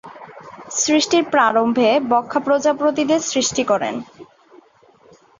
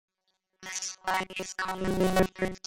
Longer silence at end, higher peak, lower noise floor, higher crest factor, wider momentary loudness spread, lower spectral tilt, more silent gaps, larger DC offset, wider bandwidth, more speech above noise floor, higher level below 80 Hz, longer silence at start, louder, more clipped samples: first, 1.15 s vs 0.1 s; first, -2 dBFS vs -10 dBFS; second, -52 dBFS vs -78 dBFS; about the same, 16 dB vs 20 dB; first, 17 LU vs 9 LU; second, -2.5 dB/octave vs -4 dB/octave; neither; neither; second, 7.8 kHz vs 16.5 kHz; second, 35 dB vs 49 dB; second, -62 dBFS vs -48 dBFS; second, 0.05 s vs 0.6 s; first, -17 LUFS vs -30 LUFS; neither